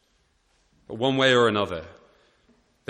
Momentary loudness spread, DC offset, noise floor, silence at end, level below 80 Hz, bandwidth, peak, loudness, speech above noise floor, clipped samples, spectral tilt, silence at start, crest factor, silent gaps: 17 LU; under 0.1%; -67 dBFS; 1 s; -60 dBFS; 10 kHz; -6 dBFS; -22 LUFS; 45 dB; under 0.1%; -5 dB/octave; 0.9 s; 20 dB; none